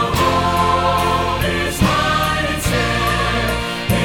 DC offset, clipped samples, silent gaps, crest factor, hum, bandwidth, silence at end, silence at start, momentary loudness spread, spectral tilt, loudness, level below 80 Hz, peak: under 0.1%; under 0.1%; none; 14 dB; none; 19.5 kHz; 0 s; 0 s; 3 LU; -4.5 dB/octave; -17 LUFS; -28 dBFS; -2 dBFS